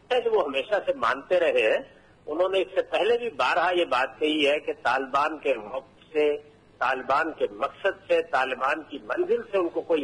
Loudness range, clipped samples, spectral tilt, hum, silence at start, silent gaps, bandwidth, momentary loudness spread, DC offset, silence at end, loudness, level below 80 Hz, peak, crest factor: 3 LU; under 0.1%; -4 dB/octave; none; 0.1 s; none; 11 kHz; 6 LU; under 0.1%; 0 s; -25 LUFS; -66 dBFS; -10 dBFS; 16 dB